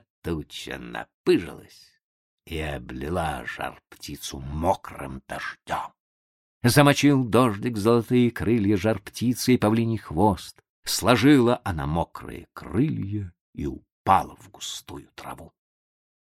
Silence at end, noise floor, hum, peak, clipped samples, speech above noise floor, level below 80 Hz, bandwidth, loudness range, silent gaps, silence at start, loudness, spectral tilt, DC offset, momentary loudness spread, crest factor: 0.75 s; under -90 dBFS; none; -4 dBFS; under 0.1%; over 66 dB; -46 dBFS; 16 kHz; 9 LU; 1.14-1.24 s, 2.03-2.38 s, 6.00-6.61 s, 10.69-10.83 s, 13.41-13.53 s, 13.92-14.05 s; 0.25 s; -24 LUFS; -5.5 dB/octave; under 0.1%; 20 LU; 22 dB